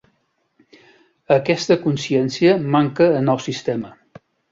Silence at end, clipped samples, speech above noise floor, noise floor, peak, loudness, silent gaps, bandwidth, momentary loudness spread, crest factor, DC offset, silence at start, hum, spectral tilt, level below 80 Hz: 0.6 s; under 0.1%; 50 dB; -67 dBFS; -2 dBFS; -18 LUFS; none; 7.8 kHz; 9 LU; 18 dB; under 0.1%; 1.3 s; none; -6 dB/octave; -60 dBFS